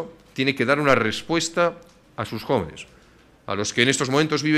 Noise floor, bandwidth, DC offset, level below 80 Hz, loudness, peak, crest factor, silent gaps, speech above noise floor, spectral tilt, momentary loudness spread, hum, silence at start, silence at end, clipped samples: -53 dBFS; 14.5 kHz; under 0.1%; -54 dBFS; -22 LUFS; -2 dBFS; 20 dB; none; 31 dB; -4 dB/octave; 16 LU; none; 0 s; 0 s; under 0.1%